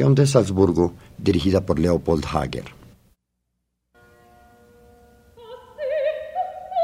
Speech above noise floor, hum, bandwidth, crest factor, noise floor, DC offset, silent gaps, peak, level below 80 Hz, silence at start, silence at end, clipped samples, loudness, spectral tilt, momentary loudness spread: 57 dB; 60 Hz at -60 dBFS; 14.5 kHz; 22 dB; -76 dBFS; under 0.1%; none; -2 dBFS; -42 dBFS; 0 s; 0 s; under 0.1%; -21 LUFS; -7 dB/octave; 17 LU